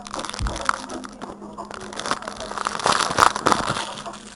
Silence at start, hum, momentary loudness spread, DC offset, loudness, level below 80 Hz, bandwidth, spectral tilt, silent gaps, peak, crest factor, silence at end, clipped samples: 0 s; none; 18 LU; under 0.1%; -23 LUFS; -40 dBFS; 15.5 kHz; -2.5 dB/octave; none; 0 dBFS; 24 dB; 0 s; under 0.1%